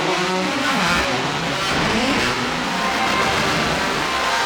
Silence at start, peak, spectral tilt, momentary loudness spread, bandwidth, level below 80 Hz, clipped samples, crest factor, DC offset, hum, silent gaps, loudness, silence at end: 0 s; -4 dBFS; -3 dB/octave; 3 LU; over 20 kHz; -42 dBFS; under 0.1%; 14 dB; under 0.1%; none; none; -19 LUFS; 0 s